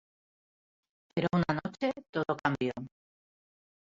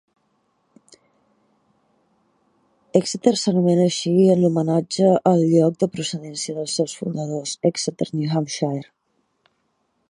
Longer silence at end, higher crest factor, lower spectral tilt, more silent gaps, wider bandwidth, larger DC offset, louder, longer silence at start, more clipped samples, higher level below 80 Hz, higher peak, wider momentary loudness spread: second, 1 s vs 1.25 s; about the same, 22 dB vs 20 dB; first, -7.5 dB/octave vs -6 dB/octave; first, 2.09-2.13 s vs none; second, 7.6 kHz vs 11.5 kHz; neither; second, -32 LUFS vs -20 LUFS; second, 1.15 s vs 2.95 s; neither; about the same, -64 dBFS vs -68 dBFS; second, -12 dBFS vs -2 dBFS; about the same, 9 LU vs 11 LU